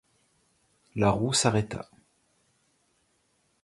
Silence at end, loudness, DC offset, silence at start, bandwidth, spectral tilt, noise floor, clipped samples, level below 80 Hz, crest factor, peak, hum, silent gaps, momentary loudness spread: 1.8 s; -27 LUFS; under 0.1%; 0.95 s; 11.5 kHz; -4.5 dB/octave; -71 dBFS; under 0.1%; -54 dBFS; 24 dB; -8 dBFS; none; none; 17 LU